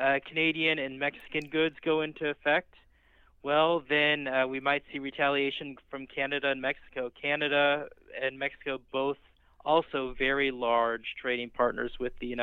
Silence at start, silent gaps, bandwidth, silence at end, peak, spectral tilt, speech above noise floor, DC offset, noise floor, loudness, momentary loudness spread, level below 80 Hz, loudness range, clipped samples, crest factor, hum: 0 s; none; 6.8 kHz; 0 s; -12 dBFS; -6.5 dB/octave; 32 dB; under 0.1%; -62 dBFS; -29 LUFS; 11 LU; -56 dBFS; 2 LU; under 0.1%; 18 dB; none